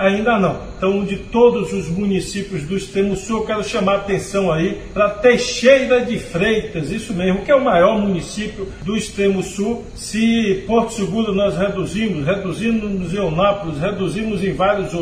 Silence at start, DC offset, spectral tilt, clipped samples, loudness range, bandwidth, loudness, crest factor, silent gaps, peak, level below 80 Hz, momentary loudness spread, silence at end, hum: 0 s; under 0.1%; -5.5 dB/octave; under 0.1%; 3 LU; 14 kHz; -18 LUFS; 18 dB; none; 0 dBFS; -38 dBFS; 9 LU; 0 s; none